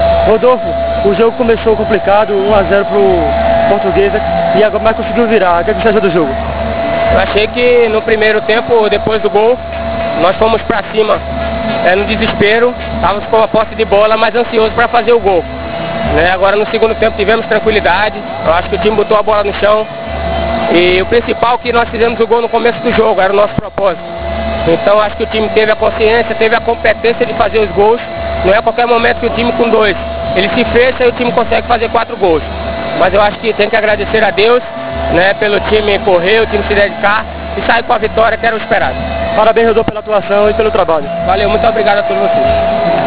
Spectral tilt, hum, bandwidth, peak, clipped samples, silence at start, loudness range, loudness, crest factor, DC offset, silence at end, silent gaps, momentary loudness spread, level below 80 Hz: -9 dB/octave; none; 4 kHz; 0 dBFS; 0.4%; 0 s; 1 LU; -11 LUFS; 10 dB; 4%; 0 s; none; 6 LU; -28 dBFS